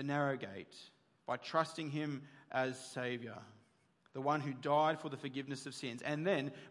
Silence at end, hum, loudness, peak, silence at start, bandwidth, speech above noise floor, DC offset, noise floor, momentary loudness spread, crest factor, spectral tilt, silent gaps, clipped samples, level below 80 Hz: 0 s; none; -39 LUFS; -20 dBFS; 0 s; 11.5 kHz; 34 dB; under 0.1%; -73 dBFS; 15 LU; 20 dB; -5.5 dB/octave; none; under 0.1%; -90 dBFS